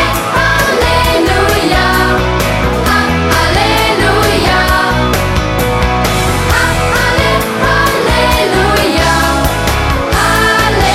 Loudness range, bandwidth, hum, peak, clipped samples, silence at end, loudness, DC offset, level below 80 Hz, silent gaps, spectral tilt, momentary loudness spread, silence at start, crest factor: 1 LU; 16.5 kHz; none; 0 dBFS; under 0.1%; 0 s; -10 LUFS; under 0.1%; -20 dBFS; none; -4.5 dB/octave; 3 LU; 0 s; 10 dB